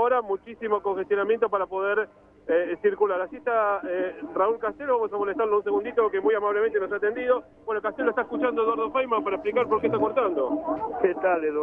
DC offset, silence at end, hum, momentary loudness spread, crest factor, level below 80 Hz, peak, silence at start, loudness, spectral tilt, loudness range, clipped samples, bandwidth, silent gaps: under 0.1%; 0 s; none; 5 LU; 16 dB; -62 dBFS; -8 dBFS; 0 s; -25 LUFS; -8 dB/octave; 1 LU; under 0.1%; 3.8 kHz; none